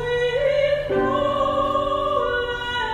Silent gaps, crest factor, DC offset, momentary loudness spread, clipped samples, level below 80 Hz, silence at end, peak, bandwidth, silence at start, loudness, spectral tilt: none; 14 dB; under 0.1%; 4 LU; under 0.1%; -42 dBFS; 0 s; -8 dBFS; 10 kHz; 0 s; -21 LUFS; -5.5 dB/octave